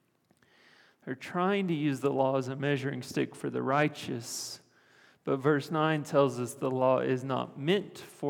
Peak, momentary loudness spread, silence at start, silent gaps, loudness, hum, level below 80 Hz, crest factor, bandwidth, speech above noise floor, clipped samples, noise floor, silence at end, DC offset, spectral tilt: -12 dBFS; 11 LU; 1.05 s; none; -30 LUFS; none; -80 dBFS; 20 dB; 18.5 kHz; 39 dB; under 0.1%; -69 dBFS; 0 s; under 0.1%; -5.5 dB/octave